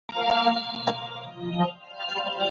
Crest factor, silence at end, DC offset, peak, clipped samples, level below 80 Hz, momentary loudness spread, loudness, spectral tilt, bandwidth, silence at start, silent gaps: 18 dB; 0 s; under 0.1%; -8 dBFS; under 0.1%; -66 dBFS; 12 LU; -27 LUFS; -5.5 dB/octave; 7.4 kHz; 0.1 s; none